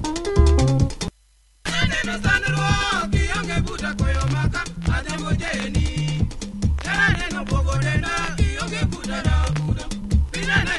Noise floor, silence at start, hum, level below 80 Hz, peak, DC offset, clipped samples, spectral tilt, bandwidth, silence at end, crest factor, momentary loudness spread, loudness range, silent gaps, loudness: -56 dBFS; 0 s; none; -26 dBFS; -4 dBFS; under 0.1%; under 0.1%; -5 dB/octave; 11.5 kHz; 0 s; 18 dB; 7 LU; 3 LU; none; -22 LUFS